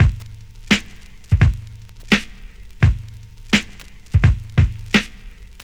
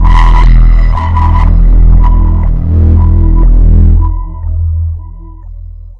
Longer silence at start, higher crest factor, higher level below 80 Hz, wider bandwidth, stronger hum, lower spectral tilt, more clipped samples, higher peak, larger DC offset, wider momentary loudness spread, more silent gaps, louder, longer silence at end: about the same, 0 s vs 0 s; first, 20 dB vs 6 dB; second, -26 dBFS vs -6 dBFS; first, 13.5 kHz vs 4.3 kHz; neither; second, -5.5 dB/octave vs -9 dB/octave; second, under 0.1% vs 0.2%; about the same, 0 dBFS vs 0 dBFS; neither; about the same, 20 LU vs 18 LU; neither; second, -19 LUFS vs -9 LUFS; first, 0.2 s vs 0.05 s